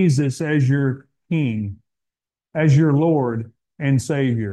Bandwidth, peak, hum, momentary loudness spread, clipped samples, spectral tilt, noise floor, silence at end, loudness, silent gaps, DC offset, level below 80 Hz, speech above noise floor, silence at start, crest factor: 11.5 kHz; -6 dBFS; none; 14 LU; under 0.1%; -7.5 dB/octave; -86 dBFS; 0 s; -20 LUFS; none; under 0.1%; -58 dBFS; 68 dB; 0 s; 14 dB